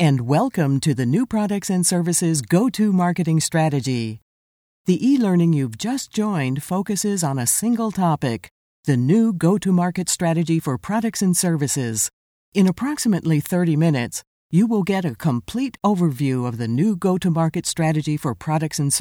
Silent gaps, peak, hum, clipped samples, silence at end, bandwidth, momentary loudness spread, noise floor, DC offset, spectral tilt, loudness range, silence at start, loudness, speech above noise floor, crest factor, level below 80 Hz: 4.22-4.85 s, 8.51-8.83 s, 12.13-12.52 s, 14.27-14.50 s; -4 dBFS; none; under 0.1%; 0 s; 18 kHz; 6 LU; under -90 dBFS; under 0.1%; -5.5 dB/octave; 2 LU; 0 s; -20 LUFS; over 71 dB; 16 dB; -56 dBFS